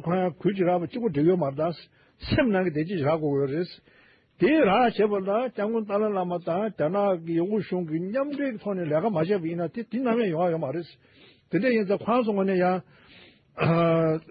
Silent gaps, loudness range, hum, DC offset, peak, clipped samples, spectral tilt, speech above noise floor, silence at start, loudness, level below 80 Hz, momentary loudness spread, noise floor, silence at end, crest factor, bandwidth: none; 3 LU; none; under 0.1%; -12 dBFS; under 0.1%; -11.5 dB/octave; 29 dB; 0 s; -25 LUFS; -56 dBFS; 8 LU; -54 dBFS; 0 s; 14 dB; 5.2 kHz